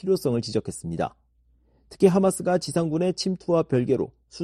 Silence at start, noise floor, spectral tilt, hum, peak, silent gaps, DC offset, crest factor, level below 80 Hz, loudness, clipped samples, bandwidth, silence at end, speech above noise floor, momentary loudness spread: 0.05 s; -63 dBFS; -6 dB/octave; none; -4 dBFS; none; under 0.1%; 20 dB; -56 dBFS; -24 LUFS; under 0.1%; 13 kHz; 0 s; 39 dB; 10 LU